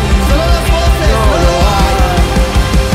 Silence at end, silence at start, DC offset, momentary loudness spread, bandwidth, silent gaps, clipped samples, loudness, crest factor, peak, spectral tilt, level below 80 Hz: 0 s; 0 s; under 0.1%; 2 LU; 16 kHz; none; under 0.1%; -11 LUFS; 10 dB; 0 dBFS; -5 dB/octave; -12 dBFS